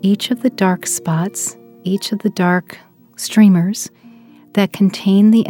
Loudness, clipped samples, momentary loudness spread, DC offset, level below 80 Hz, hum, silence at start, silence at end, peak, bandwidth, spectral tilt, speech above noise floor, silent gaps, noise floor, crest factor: -16 LUFS; under 0.1%; 12 LU; under 0.1%; -66 dBFS; none; 0.05 s; 0 s; 0 dBFS; 17 kHz; -5.5 dB/octave; 28 dB; none; -43 dBFS; 16 dB